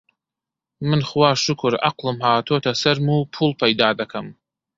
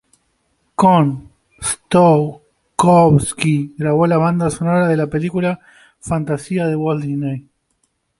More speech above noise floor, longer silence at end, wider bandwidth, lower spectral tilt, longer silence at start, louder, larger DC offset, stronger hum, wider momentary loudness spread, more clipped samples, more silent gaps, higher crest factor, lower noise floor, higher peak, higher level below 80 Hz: first, 67 dB vs 51 dB; second, 0.45 s vs 0.8 s; second, 7.8 kHz vs 11.5 kHz; second, -5 dB/octave vs -6.5 dB/octave; about the same, 0.8 s vs 0.8 s; second, -19 LUFS vs -16 LUFS; neither; neither; second, 10 LU vs 13 LU; neither; neither; about the same, 20 dB vs 16 dB; first, -87 dBFS vs -66 dBFS; about the same, -2 dBFS vs -2 dBFS; second, -58 dBFS vs -46 dBFS